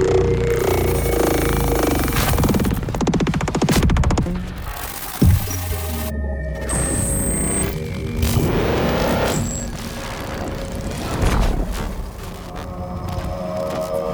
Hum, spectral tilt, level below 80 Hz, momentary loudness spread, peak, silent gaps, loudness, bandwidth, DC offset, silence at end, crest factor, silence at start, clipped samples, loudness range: none; -5 dB/octave; -26 dBFS; 11 LU; -4 dBFS; none; -21 LUFS; over 20 kHz; under 0.1%; 0 s; 16 dB; 0 s; under 0.1%; 6 LU